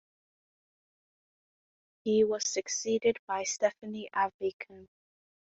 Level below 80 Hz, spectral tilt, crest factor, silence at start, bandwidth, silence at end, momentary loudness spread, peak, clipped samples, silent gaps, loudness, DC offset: -74 dBFS; -2.5 dB/octave; 20 dB; 2.05 s; 8 kHz; 0.75 s; 12 LU; -14 dBFS; under 0.1%; 3.19-3.28 s, 4.34-4.39 s, 4.53-4.59 s; -31 LUFS; under 0.1%